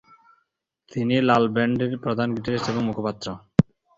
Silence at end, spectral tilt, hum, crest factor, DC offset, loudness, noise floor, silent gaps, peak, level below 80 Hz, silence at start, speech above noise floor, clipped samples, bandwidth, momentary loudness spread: 0.35 s; -7 dB/octave; none; 22 dB; under 0.1%; -23 LUFS; -73 dBFS; none; -2 dBFS; -52 dBFS; 0.9 s; 50 dB; under 0.1%; 7.8 kHz; 9 LU